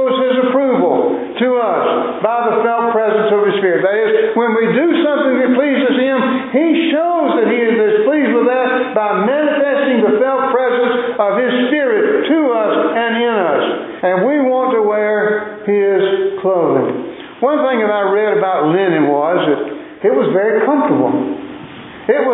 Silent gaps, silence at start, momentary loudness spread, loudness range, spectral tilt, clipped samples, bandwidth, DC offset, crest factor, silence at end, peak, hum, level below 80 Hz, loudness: none; 0 s; 4 LU; 2 LU; -10.5 dB/octave; under 0.1%; 4 kHz; under 0.1%; 12 dB; 0 s; 0 dBFS; none; -64 dBFS; -14 LUFS